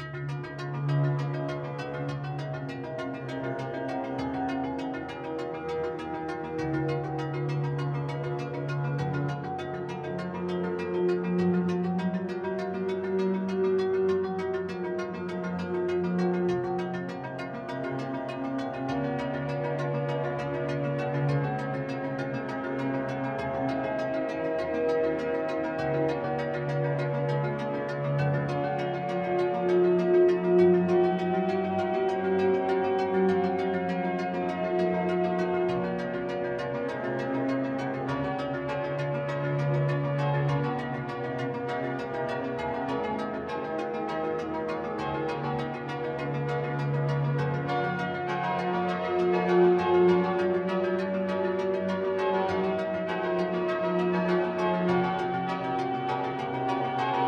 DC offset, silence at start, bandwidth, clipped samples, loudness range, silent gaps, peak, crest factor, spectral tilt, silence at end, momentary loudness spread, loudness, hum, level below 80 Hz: under 0.1%; 0 s; 8 kHz; under 0.1%; 7 LU; none; -12 dBFS; 16 dB; -8 dB/octave; 0 s; 8 LU; -29 LUFS; none; -60 dBFS